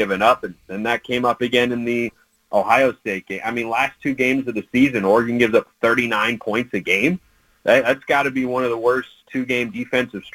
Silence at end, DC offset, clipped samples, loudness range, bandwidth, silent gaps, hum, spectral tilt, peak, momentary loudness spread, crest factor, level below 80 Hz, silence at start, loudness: 0.05 s; under 0.1%; under 0.1%; 2 LU; 17 kHz; none; none; -5 dB/octave; -2 dBFS; 9 LU; 18 dB; -56 dBFS; 0 s; -19 LUFS